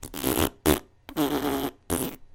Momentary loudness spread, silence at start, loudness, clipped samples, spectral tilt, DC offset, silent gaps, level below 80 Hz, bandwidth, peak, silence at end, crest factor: 6 LU; 0 s; -27 LUFS; under 0.1%; -4 dB/octave; under 0.1%; none; -44 dBFS; 17 kHz; -2 dBFS; 0.1 s; 26 dB